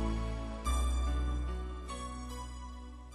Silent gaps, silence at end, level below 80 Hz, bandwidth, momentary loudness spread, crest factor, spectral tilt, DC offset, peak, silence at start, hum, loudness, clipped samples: none; 0 s; -36 dBFS; 12 kHz; 12 LU; 14 dB; -5.5 dB/octave; under 0.1%; -22 dBFS; 0 s; none; -38 LUFS; under 0.1%